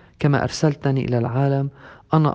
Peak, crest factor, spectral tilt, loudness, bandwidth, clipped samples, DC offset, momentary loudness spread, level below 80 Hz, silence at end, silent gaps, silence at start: -2 dBFS; 18 dB; -7 dB/octave; -21 LUFS; 8.4 kHz; under 0.1%; under 0.1%; 3 LU; -50 dBFS; 0 s; none; 0.2 s